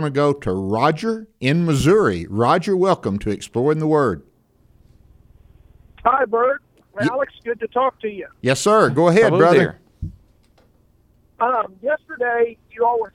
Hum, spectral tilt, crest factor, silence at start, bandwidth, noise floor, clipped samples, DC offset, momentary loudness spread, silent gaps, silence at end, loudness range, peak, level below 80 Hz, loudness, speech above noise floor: none; -6 dB/octave; 18 dB; 0 s; 15 kHz; -56 dBFS; under 0.1%; under 0.1%; 11 LU; none; 0.05 s; 6 LU; -2 dBFS; -46 dBFS; -19 LUFS; 39 dB